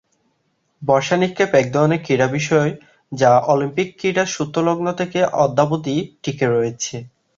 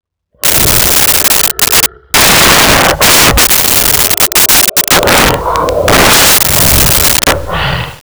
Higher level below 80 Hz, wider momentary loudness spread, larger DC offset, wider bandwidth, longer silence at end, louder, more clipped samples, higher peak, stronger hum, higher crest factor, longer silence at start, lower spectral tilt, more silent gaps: second, -56 dBFS vs -24 dBFS; first, 10 LU vs 7 LU; neither; second, 7.8 kHz vs over 20 kHz; first, 0.3 s vs 0.1 s; second, -18 LUFS vs -5 LUFS; second, under 0.1% vs 0.2%; about the same, 0 dBFS vs 0 dBFS; neither; first, 18 dB vs 8 dB; first, 0.8 s vs 0.45 s; first, -5.5 dB/octave vs -1.5 dB/octave; neither